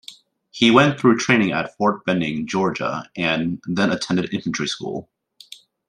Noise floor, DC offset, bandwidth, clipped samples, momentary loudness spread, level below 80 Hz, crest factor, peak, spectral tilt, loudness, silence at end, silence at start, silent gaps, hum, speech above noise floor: -45 dBFS; under 0.1%; 10.5 kHz; under 0.1%; 11 LU; -58 dBFS; 20 dB; 0 dBFS; -5 dB/octave; -20 LUFS; 0.85 s; 0.1 s; none; none; 26 dB